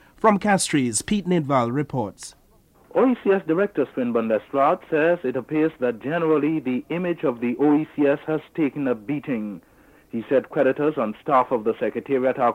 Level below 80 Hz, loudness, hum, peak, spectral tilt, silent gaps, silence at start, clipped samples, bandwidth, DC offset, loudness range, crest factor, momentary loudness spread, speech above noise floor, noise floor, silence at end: -58 dBFS; -22 LUFS; none; -4 dBFS; -5.5 dB/octave; none; 0.25 s; under 0.1%; 15 kHz; under 0.1%; 2 LU; 18 dB; 7 LU; 34 dB; -56 dBFS; 0 s